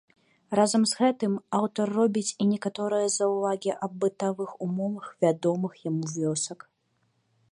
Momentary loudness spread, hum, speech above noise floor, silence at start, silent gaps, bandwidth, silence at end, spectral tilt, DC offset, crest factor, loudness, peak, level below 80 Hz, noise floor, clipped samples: 8 LU; none; 46 dB; 0.5 s; none; 11.5 kHz; 0.95 s; -5 dB/octave; under 0.1%; 18 dB; -27 LUFS; -10 dBFS; -76 dBFS; -72 dBFS; under 0.1%